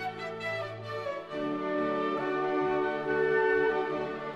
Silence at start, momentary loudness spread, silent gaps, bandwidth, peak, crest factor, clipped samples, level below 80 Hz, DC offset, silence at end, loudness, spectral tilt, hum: 0 s; 10 LU; none; 8.2 kHz; -16 dBFS; 14 dB; under 0.1%; -64 dBFS; under 0.1%; 0 s; -30 LUFS; -6.5 dB/octave; none